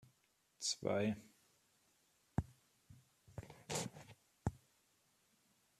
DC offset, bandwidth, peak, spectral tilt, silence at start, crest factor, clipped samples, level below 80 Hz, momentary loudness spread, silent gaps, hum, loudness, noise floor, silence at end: under 0.1%; 14 kHz; -22 dBFS; -4.5 dB/octave; 0.6 s; 24 dB; under 0.1%; -64 dBFS; 19 LU; none; none; -43 LUFS; -78 dBFS; 1.25 s